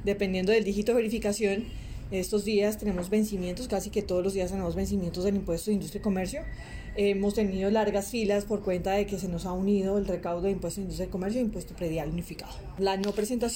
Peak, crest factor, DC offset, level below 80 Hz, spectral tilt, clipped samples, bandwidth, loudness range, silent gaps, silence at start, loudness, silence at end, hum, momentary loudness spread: -14 dBFS; 14 dB; under 0.1%; -44 dBFS; -5.5 dB/octave; under 0.1%; 16.5 kHz; 3 LU; none; 0 s; -29 LUFS; 0 s; none; 8 LU